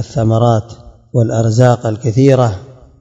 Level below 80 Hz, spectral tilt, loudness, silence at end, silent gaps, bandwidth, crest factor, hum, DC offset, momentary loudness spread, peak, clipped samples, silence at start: -44 dBFS; -7.5 dB/octave; -13 LUFS; 0.3 s; none; 7.8 kHz; 12 dB; none; under 0.1%; 7 LU; 0 dBFS; 0.2%; 0 s